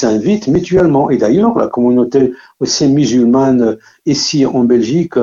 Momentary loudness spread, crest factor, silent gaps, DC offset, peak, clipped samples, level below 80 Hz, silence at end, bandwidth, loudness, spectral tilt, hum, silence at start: 6 LU; 12 dB; none; under 0.1%; 0 dBFS; under 0.1%; -44 dBFS; 0 s; 7.6 kHz; -12 LUFS; -5.5 dB/octave; none; 0 s